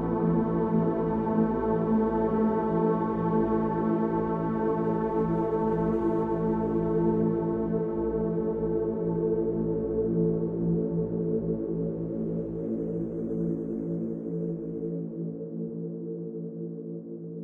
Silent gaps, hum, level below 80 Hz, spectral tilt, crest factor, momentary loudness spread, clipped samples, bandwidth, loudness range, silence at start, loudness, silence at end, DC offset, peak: none; none; -48 dBFS; -12 dB/octave; 14 dB; 9 LU; under 0.1%; 3.7 kHz; 7 LU; 0 s; -28 LUFS; 0 s; under 0.1%; -14 dBFS